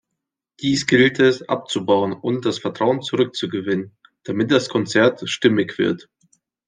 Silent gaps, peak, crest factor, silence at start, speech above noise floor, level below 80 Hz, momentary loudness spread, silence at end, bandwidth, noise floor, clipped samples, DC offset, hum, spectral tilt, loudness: none; -2 dBFS; 18 dB; 0.6 s; 62 dB; -62 dBFS; 10 LU; 0.65 s; 9.8 kHz; -81 dBFS; under 0.1%; under 0.1%; none; -5 dB/octave; -19 LUFS